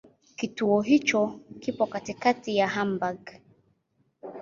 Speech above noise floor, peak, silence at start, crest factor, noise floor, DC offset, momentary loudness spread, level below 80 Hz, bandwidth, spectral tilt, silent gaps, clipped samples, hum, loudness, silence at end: 45 dB; -8 dBFS; 0.4 s; 20 dB; -71 dBFS; under 0.1%; 18 LU; -68 dBFS; 7.6 kHz; -5 dB/octave; none; under 0.1%; none; -26 LUFS; 0 s